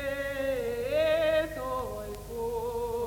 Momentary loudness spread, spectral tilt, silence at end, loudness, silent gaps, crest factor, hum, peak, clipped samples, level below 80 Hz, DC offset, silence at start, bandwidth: 11 LU; -4.5 dB/octave; 0 s; -30 LUFS; none; 14 dB; 50 Hz at -45 dBFS; -16 dBFS; under 0.1%; -48 dBFS; under 0.1%; 0 s; 18.5 kHz